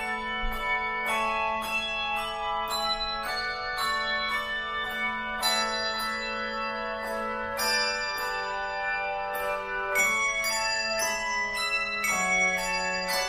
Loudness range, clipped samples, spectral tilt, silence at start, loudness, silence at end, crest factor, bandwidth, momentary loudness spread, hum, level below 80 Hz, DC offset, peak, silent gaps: 3 LU; under 0.1%; -1 dB/octave; 0 s; -27 LUFS; 0 s; 16 dB; 15.5 kHz; 6 LU; none; -48 dBFS; under 0.1%; -14 dBFS; none